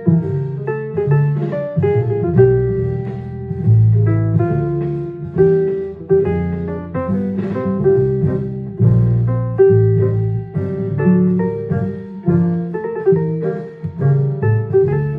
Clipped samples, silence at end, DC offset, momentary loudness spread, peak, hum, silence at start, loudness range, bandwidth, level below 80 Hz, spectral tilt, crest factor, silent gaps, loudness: under 0.1%; 0 s; under 0.1%; 10 LU; 0 dBFS; none; 0 s; 3 LU; 3.3 kHz; -40 dBFS; -12.5 dB/octave; 16 dB; none; -17 LUFS